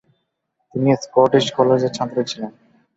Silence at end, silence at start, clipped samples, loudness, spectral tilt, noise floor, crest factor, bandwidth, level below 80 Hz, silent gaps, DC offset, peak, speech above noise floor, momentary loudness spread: 0.45 s; 0.75 s; under 0.1%; -18 LUFS; -6 dB/octave; -73 dBFS; 18 dB; 8 kHz; -62 dBFS; none; under 0.1%; -2 dBFS; 56 dB; 14 LU